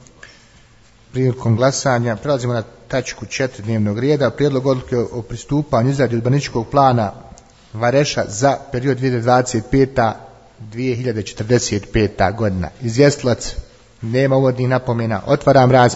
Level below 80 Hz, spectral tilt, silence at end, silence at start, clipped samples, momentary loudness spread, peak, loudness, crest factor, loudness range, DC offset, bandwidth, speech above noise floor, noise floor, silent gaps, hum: -40 dBFS; -6 dB/octave; 0 s; 1.15 s; under 0.1%; 9 LU; 0 dBFS; -17 LUFS; 18 dB; 2 LU; under 0.1%; 8 kHz; 32 dB; -48 dBFS; none; none